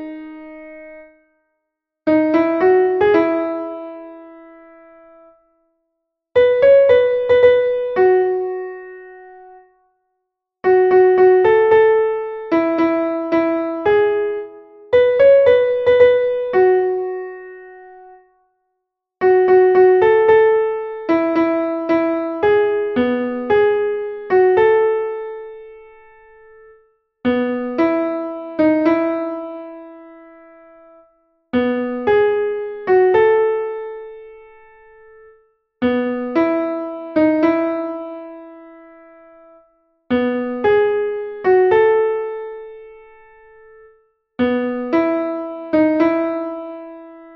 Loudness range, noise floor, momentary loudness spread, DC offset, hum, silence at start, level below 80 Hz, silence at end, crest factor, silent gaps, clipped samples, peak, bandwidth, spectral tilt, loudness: 8 LU; -77 dBFS; 20 LU; under 0.1%; none; 0 s; -54 dBFS; 0.1 s; 16 dB; none; under 0.1%; -2 dBFS; 5.8 kHz; -8 dB/octave; -16 LUFS